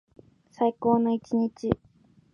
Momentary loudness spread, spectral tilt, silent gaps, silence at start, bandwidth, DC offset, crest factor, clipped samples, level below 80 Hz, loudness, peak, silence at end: 7 LU; -8.5 dB/octave; none; 0.6 s; 7 kHz; under 0.1%; 22 dB; under 0.1%; -54 dBFS; -27 LUFS; -6 dBFS; 0.6 s